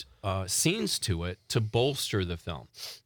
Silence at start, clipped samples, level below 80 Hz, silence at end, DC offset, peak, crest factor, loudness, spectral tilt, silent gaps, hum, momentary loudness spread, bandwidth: 0 s; under 0.1%; -56 dBFS; 0.05 s; under 0.1%; -12 dBFS; 18 dB; -29 LUFS; -4 dB/octave; none; none; 12 LU; 19.5 kHz